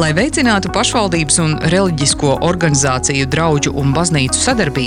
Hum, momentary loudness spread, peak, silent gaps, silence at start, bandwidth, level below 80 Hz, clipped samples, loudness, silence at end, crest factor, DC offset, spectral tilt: none; 2 LU; 0 dBFS; none; 0 s; 13 kHz; -32 dBFS; under 0.1%; -14 LUFS; 0 s; 14 dB; under 0.1%; -4 dB/octave